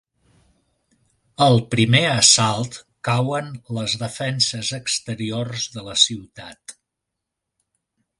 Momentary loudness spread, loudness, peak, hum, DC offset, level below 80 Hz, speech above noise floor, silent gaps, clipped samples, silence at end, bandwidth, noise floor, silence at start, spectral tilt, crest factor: 18 LU; -19 LUFS; 0 dBFS; none; under 0.1%; -56 dBFS; 62 dB; none; under 0.1%; 1.45 s; 11.5 kHz; -82 dBFS; 1.4 s; -3 dB/octave; 22 dB